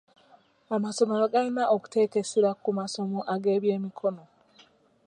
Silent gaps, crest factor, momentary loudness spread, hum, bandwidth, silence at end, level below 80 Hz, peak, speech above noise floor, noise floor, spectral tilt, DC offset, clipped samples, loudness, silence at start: none; 18 dB; 7 LU; none; 11 kHz; 0.85 s; -78 dBFS; -10 dBFS; 34 dB; -60 dBFS; -5.5 dB/octave; under 0.1%; under 0.1%; -27 LUFS; 0.7 s